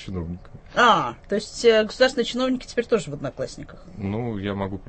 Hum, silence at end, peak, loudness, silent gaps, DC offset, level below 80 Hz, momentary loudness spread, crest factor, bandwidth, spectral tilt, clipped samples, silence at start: none; 0.05 s; -4 dBFS; -23 LUFS; none; under 0.1%; -46 dBFS; 16 LU; 18 dB; 8.8 kHz; -4.5 dB/octave; under 0.1%; 0 s